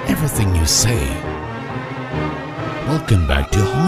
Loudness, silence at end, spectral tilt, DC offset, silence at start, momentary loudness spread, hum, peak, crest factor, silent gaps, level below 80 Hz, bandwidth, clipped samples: -19 LUFS; 0 s; -4.5 dB/octave; under 0.1%; 0 s; 12 LU; none; 0 dBFS; 18 dB; none; -26 dBFS; 16 kHz; under 0.1%